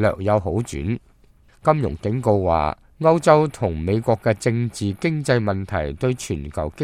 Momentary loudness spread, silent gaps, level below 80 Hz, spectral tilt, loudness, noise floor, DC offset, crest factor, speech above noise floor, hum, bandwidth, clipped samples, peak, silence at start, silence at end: 10 LU; none; -40 dBFS; -7 dB/octave; -21 LUFS; -53 dBFS; under 0.1%; 20 dB; 33 dB; none; 14 kHz; under 0.1%; 0 dBFS; 0 s; 0 s